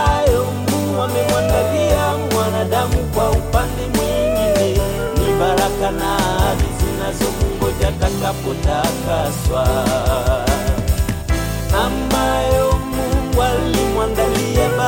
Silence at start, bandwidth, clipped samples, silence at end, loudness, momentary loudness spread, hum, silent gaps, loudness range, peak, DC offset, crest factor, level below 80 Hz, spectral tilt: 0 s; 17 kHz; under 0.1%; 0 s; -18 LUFS; 4 LU; none; none; 1 LU; -4 dBFS; under 0.1%; 12 dB; -24 dBFS; -5 dB/octave